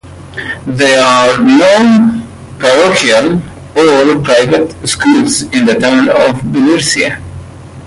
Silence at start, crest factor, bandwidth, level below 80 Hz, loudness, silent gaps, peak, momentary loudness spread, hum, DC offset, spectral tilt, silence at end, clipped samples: 0.05 s; 10 dB; 11.5 kHz; -40 dBFS; -9 LUFS; none; 0 dBFS; 14 LU; none; under 0.1%; -4 dB/octave; 0 s; under 0.1%